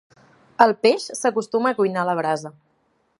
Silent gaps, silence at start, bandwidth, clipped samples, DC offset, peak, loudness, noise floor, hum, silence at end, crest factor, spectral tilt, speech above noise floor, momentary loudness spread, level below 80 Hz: none; 0.6 s; 11.5 kHz; under 0.1%; under 0.1%; 0 dBFS; -20 LUFS; -66 dBFS; none; 0.7 s; 22 dB; -4.5 dB/octave; 46 dB; 11 LU; -74 dBFS